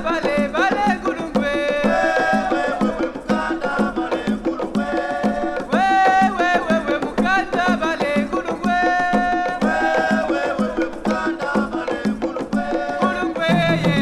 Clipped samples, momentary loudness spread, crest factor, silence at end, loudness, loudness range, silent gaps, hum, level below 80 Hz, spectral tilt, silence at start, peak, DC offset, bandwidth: under 0.1%; 6 LU; 16 dB; 0 s; -20 LUFS; 3 LU; none; none; -44 dBFS; -6 dB/octave; 0 s; -4 dBFS; under 0.1%; 12.5 kHz